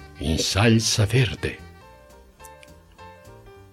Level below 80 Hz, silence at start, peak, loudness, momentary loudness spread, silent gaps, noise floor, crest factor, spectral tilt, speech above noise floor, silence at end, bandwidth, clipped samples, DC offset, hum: -42 dBFS; 0 s; -4 dBFS; -21 LUFS; 13 LU; none; -49 dBFS; 22 dB; -4.5 dB/octave; 28 dB; 0.2 s; 16 kHz; under 0.1%; under 0.1%; none